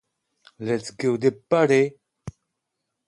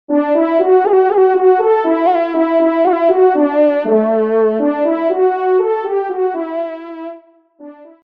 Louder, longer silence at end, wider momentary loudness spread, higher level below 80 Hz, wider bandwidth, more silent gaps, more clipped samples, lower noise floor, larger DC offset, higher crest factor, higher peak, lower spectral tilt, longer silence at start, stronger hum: second, -22 LUFS vs -13 LUFS; first, 0.8 s vs 0.2 s; first, 23 LU vs 10 LU; first, -62 dBFS vs -68 dBFS; first, 11.5 kHz vs 4.8 kHz; neither; neither; first, -80 dBFS vs -41 dBFS; second, under 0.1% vs 0.1%; first, 20 dB vs 12 dB; second, -6 dBFS vs -2 dBFS; second, -6 dB/octave vs -8.5 dB/octave; first, 0.6 s vs 0.1 s; neither